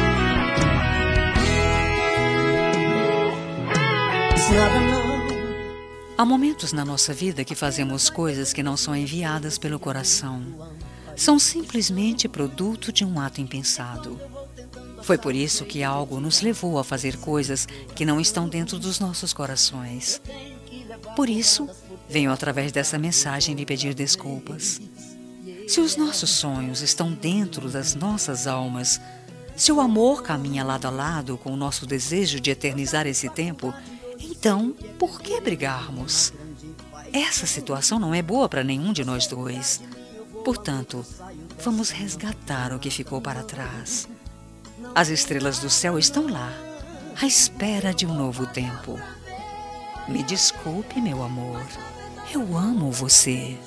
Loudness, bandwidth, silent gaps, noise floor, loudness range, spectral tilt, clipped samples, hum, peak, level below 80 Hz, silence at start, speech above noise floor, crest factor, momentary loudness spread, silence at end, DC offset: -22 LUFS; 11 kHz; none; -43 dBFS; 5 LU; -3 dB/octave; under 0.1%; none; -2 dBFS; -40 dBFS; 0 s; 20 dB; 22 dB; 17 LU; 0 s; under 0.1%